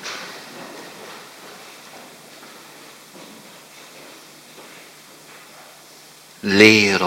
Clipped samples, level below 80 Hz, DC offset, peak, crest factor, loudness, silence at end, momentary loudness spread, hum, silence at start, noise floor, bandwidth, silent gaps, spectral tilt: under 0.1%; -68 dBFS; under 0.1%; 0 dBFS; 24 dB; -14 LUFS; 0 s; 27 LU; none; 0.05 s; -45 dBFS; 16.5 kHz; none; -3.5 dB/octave